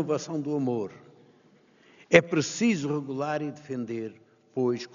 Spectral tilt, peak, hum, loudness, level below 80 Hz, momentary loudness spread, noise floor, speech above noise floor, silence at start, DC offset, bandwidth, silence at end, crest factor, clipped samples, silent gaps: -5 dB/octave; -2 dBFS; none; -27 LUFS; -68 dBFS; 15 LU; -60 dBFS; 33 dB; 0 s; under 0.1%; 7.4 kHz; 0.05 s; 26 dB; under 0.1%; none